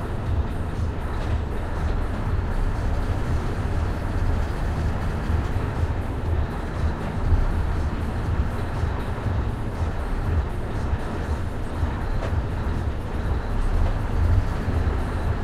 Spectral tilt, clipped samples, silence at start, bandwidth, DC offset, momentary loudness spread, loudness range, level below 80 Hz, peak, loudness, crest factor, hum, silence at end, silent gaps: -7.5 dB/octave; under 0.1%; 0 s; 12 kHz; under 0.1%; 3 LU; 2 LU; -26 dBFS; -8 dBFS; -27 LUFS; 16 dB; none; 0 s; none